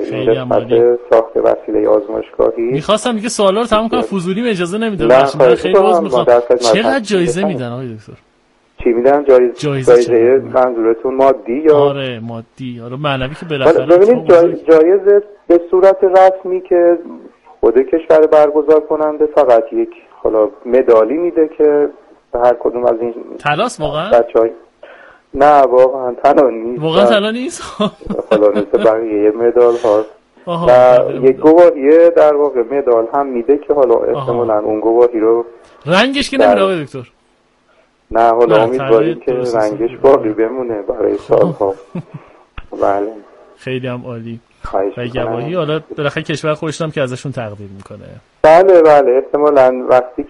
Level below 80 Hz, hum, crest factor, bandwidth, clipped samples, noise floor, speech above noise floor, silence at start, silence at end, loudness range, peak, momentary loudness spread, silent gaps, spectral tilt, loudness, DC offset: -44 dBFS; none; 12 dB; 11.5 kHz; under 0.1%; -55 dBFS; 44 dB; 0 s; 0.05 s; 8 LU; 0 dBFS; 13 LU; none; -6 dB/octave; -12 LUFS; under 0.1%